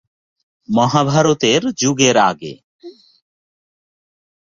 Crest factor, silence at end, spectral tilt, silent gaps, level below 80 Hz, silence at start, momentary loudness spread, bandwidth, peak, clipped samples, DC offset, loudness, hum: 18 dB; 1.5 s; -4 dB/octave; 2.63-2.79 s; -56 dBFS; 0.7 s; 8 LU; 7.6 kHz; 0 dBFS; under 0.1%; under 0.1%; -15 LUFS; none